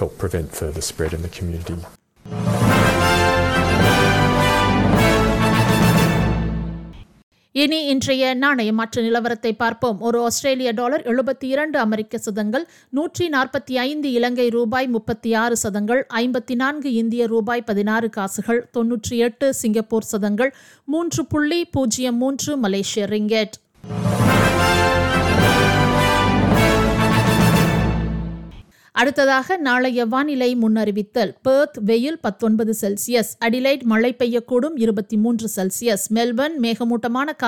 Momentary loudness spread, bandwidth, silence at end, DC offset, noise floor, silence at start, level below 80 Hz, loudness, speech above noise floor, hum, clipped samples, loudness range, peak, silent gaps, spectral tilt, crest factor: 9 LU; 18.5 kHz; 0 s; under 0.1%; -41 dBFS; 0 s; -36 dBFS; -19 LUFS; 22 dB; none; under 0.1%; 5 LU; -4 dBFS; 7.23-7.32 s; -5 dB/octave; 16 dB